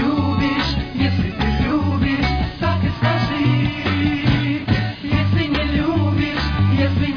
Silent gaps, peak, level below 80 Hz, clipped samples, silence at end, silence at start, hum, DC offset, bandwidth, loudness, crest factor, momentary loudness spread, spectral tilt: none; -4 dBFS; -30 dBFS; under 0.1%; 0 s; 0 s; none; under 0.1%; 5.4 kHz; -19 LUFS; 14 dB; 3 LU; -7.5 dB/octave